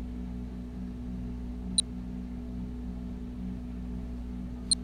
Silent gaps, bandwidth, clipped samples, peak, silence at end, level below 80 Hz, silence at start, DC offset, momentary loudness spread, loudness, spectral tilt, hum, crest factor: none; 13 kHz; under 0.1%; -10 dBFS; 0 s; -40 dBFS; 0 s; under 0.1%; 10 LU; -36 LUFS; -3.5 dB/octave; 60 Hz at -40 dBFS; 24 dB